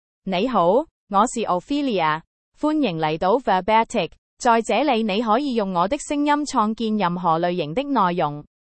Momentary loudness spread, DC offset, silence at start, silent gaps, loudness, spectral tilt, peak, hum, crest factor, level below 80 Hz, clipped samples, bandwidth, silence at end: 6 LU; under 0.1%; 0.25 s; 0.91-1.07 s, 2.27-2.52 s, 4.18-4.37 s; -21 LUFS; -5 dB/octave; -4 dBFS; none; 16 dB; -52 dBFS; under 0.1%; 8.8 kHz; 0.25 s